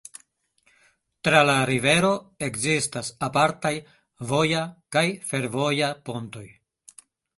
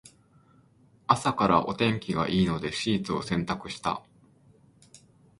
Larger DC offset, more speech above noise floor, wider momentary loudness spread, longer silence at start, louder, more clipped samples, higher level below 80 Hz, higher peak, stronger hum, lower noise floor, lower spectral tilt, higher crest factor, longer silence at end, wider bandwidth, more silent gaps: neither; first, 43 dB vs 33 dB; first, 15 LU vs 9 LU; first, 1.25 s vs 1.1 s; first, -23 LUFS vs -27 LUFS; neither; second, -60 dBFS vs -54 dBFS; about the same, -2 dBFS vs -4 dBFS; neither; first, -67 dBFS vs -60 dBFS; second, -4 dB/octave vs -5.5 dB/octave; about the same, 24 dB vs 26 dB; first, 0.9 s vs 0.45 s; about the same, 12 kHz vs 11.5 kHz; neither